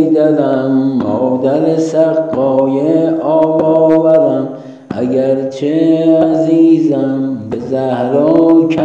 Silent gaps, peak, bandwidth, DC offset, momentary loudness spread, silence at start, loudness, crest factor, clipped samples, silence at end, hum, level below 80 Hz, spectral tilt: none; 0 dBFS; 7.6 kHz; under 0.1%; 8 LU; 0 s; -12 LUFS; 10 dB; under 0.1%; 0 s; none; -56 dBFS; -8.5 dB/octave